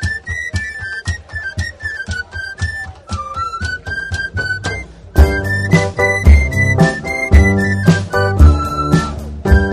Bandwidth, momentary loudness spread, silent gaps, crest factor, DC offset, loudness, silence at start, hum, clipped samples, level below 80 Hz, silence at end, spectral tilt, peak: 13 kHz; 13 LU; none; 14 dB; under 0.1%; -15 LUFS; 0 s; none; 0.3%; -18 dBFS; 0 s; -6.5 dB/octave; 0 dBFS